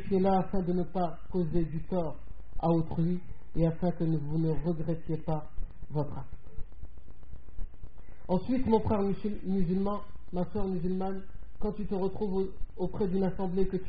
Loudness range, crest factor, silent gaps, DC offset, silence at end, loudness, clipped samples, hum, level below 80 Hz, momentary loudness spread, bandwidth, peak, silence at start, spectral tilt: 6 LU; 18 dB; none; 2%; 0 s; -32 LUFS; under 0.1%; none; -42 dBFS; 20 LU; 5 kHz; -12 dBFS; 0 s; -9 dB/octave